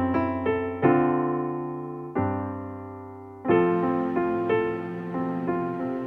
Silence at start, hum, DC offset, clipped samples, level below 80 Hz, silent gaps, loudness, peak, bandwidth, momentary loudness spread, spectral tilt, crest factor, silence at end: 0 s; none; under 0.1%; under 0.1%; -58 dBFS; none; -26 LUFS; -6 dBFS; 4.2 kHz; 13 LU; -10 dB/octave; 18 dB; 0 s